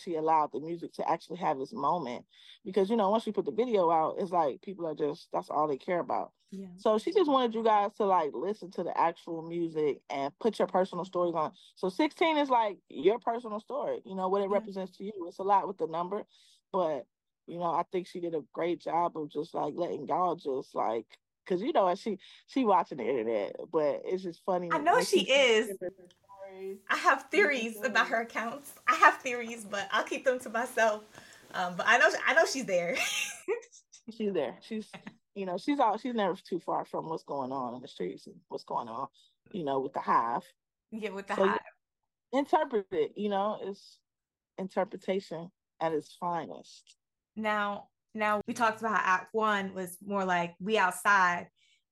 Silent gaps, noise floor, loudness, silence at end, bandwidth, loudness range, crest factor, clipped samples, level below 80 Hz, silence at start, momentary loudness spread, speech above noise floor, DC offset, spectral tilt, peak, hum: none; under -90 dBFS; -30 LUFS; 0.45 s; 16.5 kHz; 7 LU; 24 dB; under 0.1%; -82 dBFS; 0 s; 14 LU; over 59 dB; under 0.1%; -4 dB/octave; -8 dBFS; none